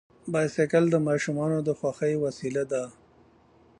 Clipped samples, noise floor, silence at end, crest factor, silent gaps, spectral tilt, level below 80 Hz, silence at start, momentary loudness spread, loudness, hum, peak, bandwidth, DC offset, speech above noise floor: under 0.1%; -59 dBFS; 0.9 s; 18 dB; none; -6.5 dB/octave; -66 dBFS; 0.25 s; 8 LU; -27 LUFS; none; -8 dBFS; 10.5 kHz; under 0.1%; 33 dB